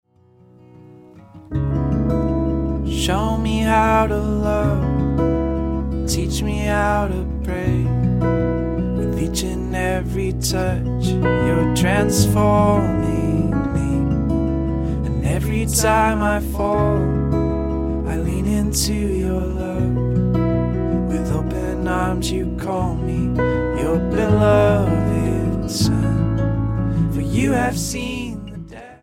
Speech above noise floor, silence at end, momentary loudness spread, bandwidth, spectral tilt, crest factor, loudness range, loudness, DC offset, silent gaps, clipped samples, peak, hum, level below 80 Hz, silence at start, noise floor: 33 dB; 0.05 s; 7 LU; 16.5 kHz; -6 dB/octave; 16 dB; 3 LU; -19 LUFS; under 0.1%; none; under 0.1%; -2 dBFS; none; -28 dBFS; 0.75 s; -51 dBFS